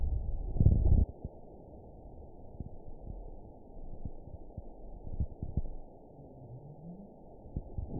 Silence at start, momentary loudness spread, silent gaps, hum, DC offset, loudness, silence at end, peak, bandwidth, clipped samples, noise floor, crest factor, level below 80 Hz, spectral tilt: 0 s; 23 LU; none; none; under 0.1%; -35 LUFS; 0 s; -10 dBFS; 1 kHz; under 0.1%; -52 dBFS; 24 dB; -38 dBFS; -17.5 dB/octave